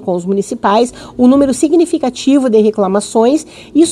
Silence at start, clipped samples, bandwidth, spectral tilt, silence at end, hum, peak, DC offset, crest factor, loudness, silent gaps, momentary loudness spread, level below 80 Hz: 0 s; under 0.1%; 12.5 kHz; -5.5 dB/octave; 0 s; none; 0 dBFS; under 0.1%; 12 dB; -12 LUFS; none; 7 LU; -48 dBFS